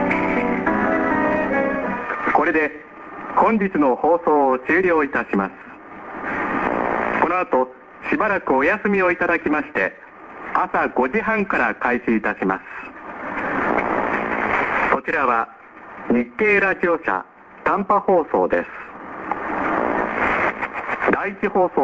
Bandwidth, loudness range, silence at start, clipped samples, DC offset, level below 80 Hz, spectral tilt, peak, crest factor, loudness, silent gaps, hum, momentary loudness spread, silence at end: 7.8 kHz; 2 LU; 0 s; under 0.1%; under 0.1%; -50 dBFS; -7.5 dB/octave; 0 dBFS; 20 dB; -20 LUFS; none; none; 13 LU; 0 s